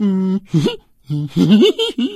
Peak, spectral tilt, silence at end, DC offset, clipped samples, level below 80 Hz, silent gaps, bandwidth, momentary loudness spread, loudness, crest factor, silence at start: 0 dBFS; -7 dB/octave; 0 s; under 0.1%; under 0.1%; -52 dBFS; none; 13.5 kHz; 13 LU; -16 LUFS; 14 dB; 0 s